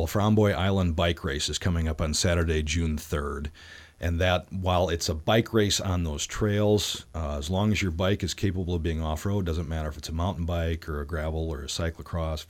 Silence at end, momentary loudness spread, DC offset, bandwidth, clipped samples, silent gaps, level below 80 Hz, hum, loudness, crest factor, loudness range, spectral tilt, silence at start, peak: 0.05 s; 9 LU; under 0.1%; 16.5 kHz; under 0.1%; none; -36 dBFS; none; -27 LUFS; 18 dB; 4 LU; -5 dB/octave; 0 s; -10 dBFS